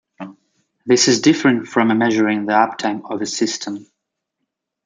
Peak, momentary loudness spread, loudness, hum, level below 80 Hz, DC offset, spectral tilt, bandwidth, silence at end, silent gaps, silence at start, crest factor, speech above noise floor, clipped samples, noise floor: -2 dBFS; 20 LU; -17 LUFS; none; -64 dBFS; under 0.1%; -3.5 dB/octave; 9.6 kHz; 1.05 s; none; 0.2 s; 16 dB; 61 dB; under 0.1%; -78 dBFS